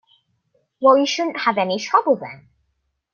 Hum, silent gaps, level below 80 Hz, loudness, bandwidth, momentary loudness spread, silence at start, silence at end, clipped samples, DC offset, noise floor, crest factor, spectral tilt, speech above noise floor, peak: none; none; -68 dBFS; -18 LUFS; 7 kHz; 7 LU; 0.8 s; 0.8 s; under 0.1%; under 0.1%; -72 dBFS; 18 dB; -4 dB/octave; 53 dB; -2 dBFS